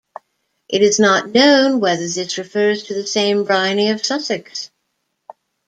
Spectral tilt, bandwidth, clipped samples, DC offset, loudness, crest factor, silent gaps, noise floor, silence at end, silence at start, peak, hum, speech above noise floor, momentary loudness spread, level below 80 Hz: -3 dB/octave; 9.2 kHz; under 0.1%; under 0.1%; -16 LUFS; 16 dB; none; -72 dBFS; 1 s; 0.7 s; -2 dBFS; none; 56 dB; 11 LU; -64 dBFS